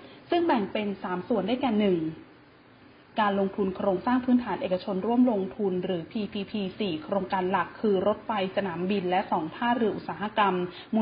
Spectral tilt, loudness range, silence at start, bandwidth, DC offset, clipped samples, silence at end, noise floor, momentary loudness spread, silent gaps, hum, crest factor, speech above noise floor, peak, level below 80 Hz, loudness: -10.5 dB/octave; 2 LU; 0 s; 5.2 kHz; under 0.1%; under 0.1%; 0 s; -54 dBFS; 7 LU; none; none; 16 dB; 27 dB; -12 dBFS; -62 dBFS; -28 LUFS